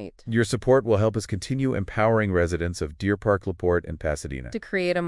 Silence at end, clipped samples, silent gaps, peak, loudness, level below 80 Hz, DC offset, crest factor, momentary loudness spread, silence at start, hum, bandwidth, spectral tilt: 0 s; under 0.1%; none; -8 dBFS; -25 LUFS; -44 dBFS; under 0.1%; 16 dB; 9 LU; 0 s; none; 12 kHz; -6.5 dB/octave